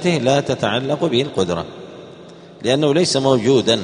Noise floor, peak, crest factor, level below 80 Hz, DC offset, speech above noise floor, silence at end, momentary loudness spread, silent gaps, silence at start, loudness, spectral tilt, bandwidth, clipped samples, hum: -40 dBFS; 0 dBFS; 18 dB; -54 dBFS; under 0.1%; 23 dB; 0 s; 16 LU; none; 0 s; -17 LUFS; -5 dB/octave; 10.5 kHz; under 0.1%; none